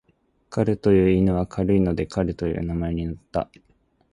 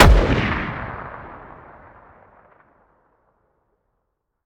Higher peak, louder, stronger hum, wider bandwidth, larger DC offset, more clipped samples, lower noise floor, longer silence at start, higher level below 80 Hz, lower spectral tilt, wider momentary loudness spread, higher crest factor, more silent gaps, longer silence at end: second, -6 dBFS vs 0 dBFS; second, -23 LUFS vs -20 LUFS; neither; second, 10.5 kHz vs 16 kHz; neither; neither; second, -65 dBFS vs -75 dBFS; first, 0.5 s vs 0 s; second, -38 dBFS vs -24 dBFS; first, -9 dB/octave vs -6 dB/octave; second, 11 LU vs 26 LU; about the same, 18 dB vs 22 dB; neither; second, 0.7 s vs 3.05 s